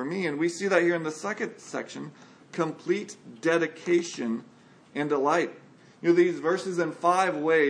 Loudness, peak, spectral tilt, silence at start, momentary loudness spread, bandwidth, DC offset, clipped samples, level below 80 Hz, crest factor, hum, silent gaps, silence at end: -27 LUFS; -8 dBFS; -5 dB/octave; 0 s; 12 LU; 10.5 kHz; under 0.1%; under 0.1%; -84 dBFS; 20 dB; none; none; 0 s